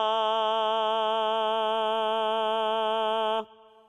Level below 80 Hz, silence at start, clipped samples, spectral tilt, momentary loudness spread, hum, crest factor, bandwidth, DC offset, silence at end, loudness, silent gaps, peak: -88 dBFS; 0 s; under 0.1%; -3 dB/octave; 2 LU; none; 12 dB; 11.5 kHz; under 0.1%; 0.45 s; -26 LUFS; none; -16 dBFS